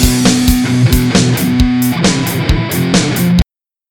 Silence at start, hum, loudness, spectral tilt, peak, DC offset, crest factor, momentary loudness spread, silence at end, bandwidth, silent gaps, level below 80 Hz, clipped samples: 0 s; none; -12 LUFS; -5 dB/octave; 0 dBFS; under 0.1%; 12 dB; 4 LU; 0.5 s; 19 kHz; none; -20 dBFS; under 0.1%